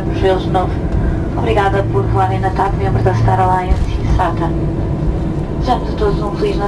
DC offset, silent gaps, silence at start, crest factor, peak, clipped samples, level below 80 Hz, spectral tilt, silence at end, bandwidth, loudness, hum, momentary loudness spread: under 0.1%; none; 0 s; 14 dB; 0 dBFS; under 0.1%; -20 dBFS; -8 dB/octave; 0 s; 10.5 kHz; -16 LUFS; none; 5 LU